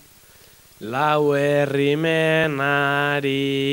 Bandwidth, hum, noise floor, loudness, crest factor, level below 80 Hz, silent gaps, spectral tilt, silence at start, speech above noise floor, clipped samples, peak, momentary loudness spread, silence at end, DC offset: 16.5 kHz; none; -50 dBFS; -20 LUFS; 16 dB; -60 dBFS; none; -6 dB/octave; 0.8 s; 30 dB; under 0.1%; -6 dBFS; 4 LU; 0 s; under 0.1%